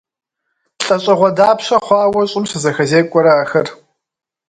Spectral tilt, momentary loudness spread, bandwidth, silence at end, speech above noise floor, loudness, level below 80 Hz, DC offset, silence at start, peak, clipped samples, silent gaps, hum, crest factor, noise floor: -5 dB/octave; 6 LU; 9.4 kHz; 0.75 s; 57 dB; -13 LUFS; -58 dBFS; under 0.1%; 0.8 s; 0 dBFS; under 0.1%; none; none; 14 dB; -69 dBFS